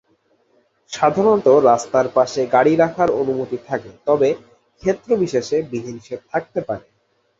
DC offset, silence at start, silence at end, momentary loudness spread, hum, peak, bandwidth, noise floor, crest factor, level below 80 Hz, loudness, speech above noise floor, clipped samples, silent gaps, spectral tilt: under 0.1%; 0.9 s; 0.6 s; 15 LU; none; -2 dBFS; 8 kHz; -61 dBFS; 18 dB; -58 dBFS; -18 LUFS; 44 dB; under 0.1%; none; -6 dB/octave